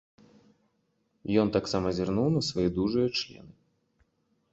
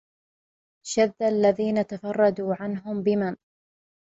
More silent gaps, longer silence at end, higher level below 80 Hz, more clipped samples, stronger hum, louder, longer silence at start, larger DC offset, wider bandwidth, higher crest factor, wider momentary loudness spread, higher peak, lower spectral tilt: neither; first, 1.05 s vs 0.8 s; first, -54 dBFS vs -66 dBFS; neither; neither; second, -28 LUFS vs -25 LUFS; first, 1.25 s vs 0.85 s; neither; about the same, 8.2 kHz vs 8 kHz; about the same, 20 dB vs 18 dB; second, 6 LU vs 9 LU; about the same, -10 dBFS vs -8 dBFS; about the same, -6 dB/octave vs -5.5 dB/octave